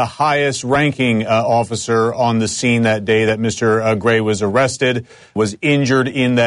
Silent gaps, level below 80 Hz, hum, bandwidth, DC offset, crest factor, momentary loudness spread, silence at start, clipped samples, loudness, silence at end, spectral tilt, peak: none; -50 dBFS; none; 11 kHz; under 0.1%; 12 dB; 3 LU; 0 s; under 0.1%; -16 LUFS; 0 s; -5 dB/octave; -4 dBFS